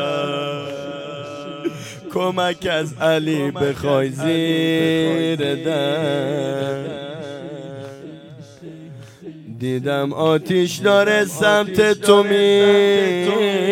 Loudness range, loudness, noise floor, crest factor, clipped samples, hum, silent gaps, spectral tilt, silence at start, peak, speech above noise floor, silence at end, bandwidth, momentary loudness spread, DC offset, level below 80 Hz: 12 LU; -18 LUFS; -39 dBFS; 18 dB; under 0.1%; none; none; -5 dB/octave; 0 s; 0 dBFS; 22 dB; 0 s; 16.5 kHz; 21 LU; under 0.1%; -58 dBFS